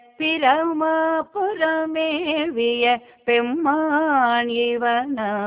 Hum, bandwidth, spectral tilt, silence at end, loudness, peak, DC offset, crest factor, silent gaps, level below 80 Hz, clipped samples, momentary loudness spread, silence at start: none; 4 kHz; -7.5 dB/octave; 0 s; -20 LUFS; -4 dBFS; under 0.1%; 18 dB; none; -64 dBFS; under 0.1%; 5 LU; 0.2 s